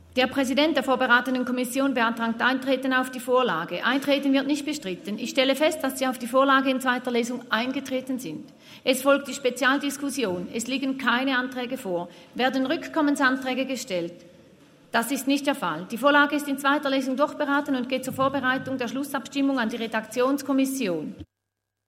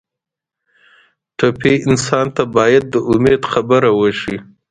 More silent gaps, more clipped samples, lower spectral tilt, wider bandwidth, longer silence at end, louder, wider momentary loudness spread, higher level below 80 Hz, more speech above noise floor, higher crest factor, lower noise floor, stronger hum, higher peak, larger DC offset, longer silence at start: neither; neither; second, -3.5 dB/octave vs -5.5 dB/octave; first, 16 kHz vs 9.6 kHz; first, 0.65 s vs 0.25 s; second, -25 LUFS vs -14 LUFS; about the same, 9 LU vs 9 LU; second, -70 dBFS vs -46 dBFS; second, 58 dB vs 70 dB; about the same, 18 dB vs 16 dB; about the same, -82 dBFS vs -84 dBFS; neither; second, -6 dBFS vs 0 dBFS; neither; second, 0.15 s vs 1.4 s